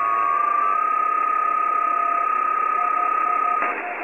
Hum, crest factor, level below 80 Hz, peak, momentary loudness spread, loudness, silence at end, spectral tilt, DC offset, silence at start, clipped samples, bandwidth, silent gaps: none; 12 dB; -70 dBFS; -8 dBFS; 1 LU; -20 LUFS; 0 s; -3.5 dB/octave; 0.1%; 0 s; under 0.1%; 8.8 kHz; none